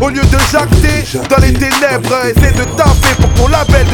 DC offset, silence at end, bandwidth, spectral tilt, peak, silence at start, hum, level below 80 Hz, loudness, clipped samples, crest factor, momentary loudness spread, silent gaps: under 0.1%; 0 s; 19 kHz; -5 dB/octave; 0 dBFS; 0 s; none; -14 dBFS; -10 LUFS; 1%; 8 dB; 3 LU; none